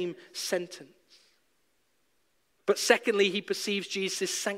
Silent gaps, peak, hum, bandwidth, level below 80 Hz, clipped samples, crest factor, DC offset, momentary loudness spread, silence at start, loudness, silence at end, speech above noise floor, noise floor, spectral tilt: none; -6 dBFS; none; 16 kHz; -82 dBFS; under 0.1%; 26 dB; under 0.1%; 12 LU; 0 s; -29 LUFS; 0 s; 45 dB; -74 dBFS; -2.5 dB/octave